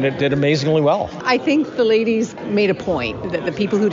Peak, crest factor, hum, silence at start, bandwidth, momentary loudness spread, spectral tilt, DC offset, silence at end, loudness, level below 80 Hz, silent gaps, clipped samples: -4 dBFS; 14 dB; none; 0 s; 7.6 kHz; 6 LU; -5 dB/octave; under 0.1%; 0 s; -18 LUFS; -50 dBFS; none; under 0.1%